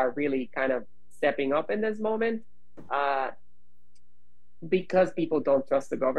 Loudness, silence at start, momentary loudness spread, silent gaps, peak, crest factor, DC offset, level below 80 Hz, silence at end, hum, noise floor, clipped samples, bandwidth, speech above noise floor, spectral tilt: -28 LUFS; 0 s; 7 LU; none; -10 dBFS; 18 dB; 1%; -66 dBFS; 0 s; none; -70 dBFS; under 0.1%; 9.8 kHz; 43 dB; -6.5 dB/octave